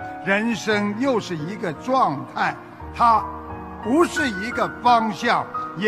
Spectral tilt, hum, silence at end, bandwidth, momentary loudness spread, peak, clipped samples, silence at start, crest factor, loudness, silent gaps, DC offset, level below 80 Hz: -5 dB/octave; none; 0 s; 15 kHz; 12 LU; -4 dBFS; under 0.1%; 0 s; 18 dB; -21 LUFS; none; under 0.1%; -48 dBFS